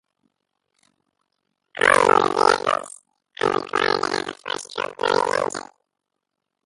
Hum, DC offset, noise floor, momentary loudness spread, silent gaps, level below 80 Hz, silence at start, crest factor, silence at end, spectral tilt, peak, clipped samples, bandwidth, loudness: none; under 0.1%; -81 dBFS; 14 LU; none; -62 dBFS; 1.75 s; 24 dB; 1.05 s; -2.5 dB/octave; 0 dBFS; under 0.1%; 11.5 kHz; -21 LUFS